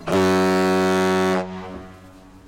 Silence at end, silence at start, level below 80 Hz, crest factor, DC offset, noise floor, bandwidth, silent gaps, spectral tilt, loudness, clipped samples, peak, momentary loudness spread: 0.1 s; 0 s; -54 dBFS; 10 dB; under 0.1%; -45 dBFS; 17 kHz; none; -5.5 dB/octave; -19 LUFS; under 0.1%; -10 dBFS; 17 LU